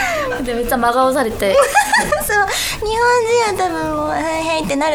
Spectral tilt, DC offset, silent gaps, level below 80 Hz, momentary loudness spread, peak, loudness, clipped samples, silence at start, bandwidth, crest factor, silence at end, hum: -3 dB/octave; under 0.1%; none; -36 dBFS; 6 LU; 0 dBFS; -16 LUFS; under 0.1%; 0 s; over 20 kHz; 16 dB; 0 s; none